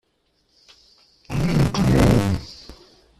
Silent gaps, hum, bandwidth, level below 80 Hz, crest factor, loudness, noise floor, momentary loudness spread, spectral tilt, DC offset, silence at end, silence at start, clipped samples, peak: none; none; 14.5 kHz; -34 dBFS; 20 dB; -20 LUFS; -67 dBFS; 18 LU; -7 dB/octave; under 0.1%; 0.45 s; 1.3 s; under 0.1%; -2 dBFS